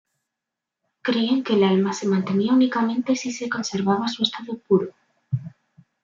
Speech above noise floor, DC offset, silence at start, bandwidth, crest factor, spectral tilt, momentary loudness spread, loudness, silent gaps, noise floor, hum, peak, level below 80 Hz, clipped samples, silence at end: 64 dB; under 0.1%; 1.05 s; 7.6 kHz; 18 dB; -5.5 dB/octave; 11 LU; -22 LUFS; none; -85 dBFS; none; -6 dBFS; -70 dBFS; under 0.1%; 0.55 s